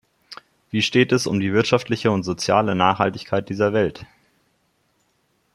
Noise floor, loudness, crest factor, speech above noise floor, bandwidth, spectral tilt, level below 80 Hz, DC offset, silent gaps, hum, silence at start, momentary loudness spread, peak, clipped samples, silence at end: -67 dBFS; -20 LUFS; 20 dB; 47 dB; 15 kHz; -5 dB/octave; -58 dBFS; under 0.1%; none; none; 0.3 s; 13 LU; -2 dBFS; under 0.1%; 1.5 s